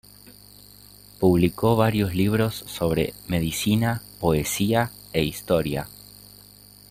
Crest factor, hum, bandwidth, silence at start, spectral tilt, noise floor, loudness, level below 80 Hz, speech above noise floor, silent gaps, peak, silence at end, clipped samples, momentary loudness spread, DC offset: 20 dB; 50 Hz at -45 dBFS; 16 kHz; 0.25 s; -5.5 dB/octave; -49 dBFS; -23 LUFS; -46 dBFS; 27 dB; none; -6 dBFS; 1 s; under 0.1%; 7 LU; under 0.1%